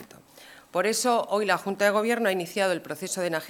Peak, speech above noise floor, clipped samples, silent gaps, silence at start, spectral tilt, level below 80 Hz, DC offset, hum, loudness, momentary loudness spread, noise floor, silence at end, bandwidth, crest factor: -6 dBFS; 25 dB; under 0.1%; none; 0 s; -3 dB/octave; -74 dBFS; under 0.1%; none; -26 LUFS; 7 LU; -51 dBFS; 0 s; 18 kHz; 20 dB